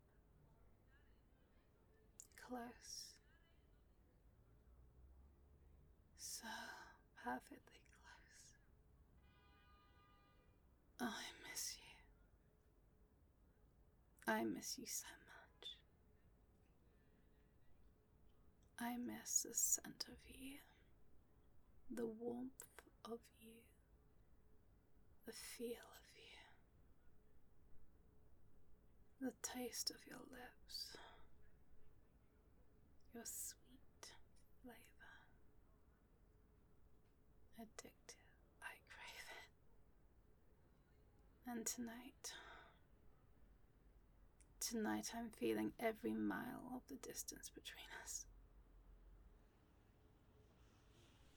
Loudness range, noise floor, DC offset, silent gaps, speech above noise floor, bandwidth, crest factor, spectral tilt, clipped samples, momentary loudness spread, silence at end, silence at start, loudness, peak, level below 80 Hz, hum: 17 LU; -74 dBFS; under 0.1%; none; 25 dB; over 20 kHz; 30 dB; -2 dB/octave; under 0.1%; 21 LU; 0 s; 0.05 s; -49 LUFS; -26 dBFS; -74 dBFS; none